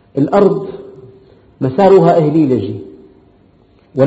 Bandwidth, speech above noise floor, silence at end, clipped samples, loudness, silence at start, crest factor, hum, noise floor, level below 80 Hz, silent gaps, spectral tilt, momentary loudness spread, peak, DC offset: 7.8 kHz; 38 dB; 0 s; 0.1%; -12 LUFS; 0.15 s; 14 dB; none; -49 dBFS; -50 dBFS; none; -9.5 dB/octave; 19 LU; 0 dBFS; under 0.1%